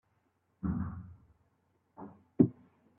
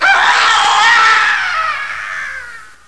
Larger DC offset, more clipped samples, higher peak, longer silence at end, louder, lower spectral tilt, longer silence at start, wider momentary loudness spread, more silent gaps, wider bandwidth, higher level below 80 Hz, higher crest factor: second, under 0.1% vs 1%; neither; second, -10 dBFS vs 0 dBFS; first, 0.45 s vs 0.25 s; second, -33 LUFS vs -10 LUFS; first, -13.5 dB/octave vs 1.5 dB/octave; first, 0.65 s vs 0 s; first, 22 LU vs 16 LU; neither; second, 2.6 kHz vs 11 kHz; second, -58 dBFS vs -50 dBFS; first, 26 dB vs 12 dB